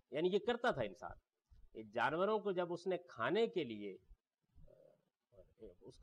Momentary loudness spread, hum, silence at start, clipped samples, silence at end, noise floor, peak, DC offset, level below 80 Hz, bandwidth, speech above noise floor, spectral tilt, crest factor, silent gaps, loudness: 22 LU; none; 0.1 s; under 0.1%; 0 s; -74 dBFS; -26 dBFS; under 0.1%; -70 dBFS; 9.8 kHz; 34 dB; -6 dB/octave; 16 dB; none; -39 LUFS